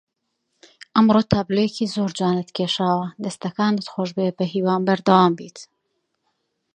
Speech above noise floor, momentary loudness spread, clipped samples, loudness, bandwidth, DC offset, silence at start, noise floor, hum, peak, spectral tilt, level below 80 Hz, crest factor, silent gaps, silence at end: 55 dB; 11 LU; under 0.1%; -21 LUFS; 9.8 kHz; under 0.1%; 0.95 s; -75 dBFS; none; -2 dBFS; -6.5 dB/octave; -54 dBFS; 20 dB; none; 1.1 s